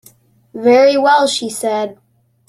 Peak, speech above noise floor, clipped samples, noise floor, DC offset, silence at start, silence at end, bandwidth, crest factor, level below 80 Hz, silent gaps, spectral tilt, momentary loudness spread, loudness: 0 dBFS; 36 dB; under 0.1%; -49 dBFS; under 0.1%; 0.55 s; 0.55 s; 14 kHz; 14 dB; -64 dBFS; none; -3 dB/octave; 13 LU; -13 LUFS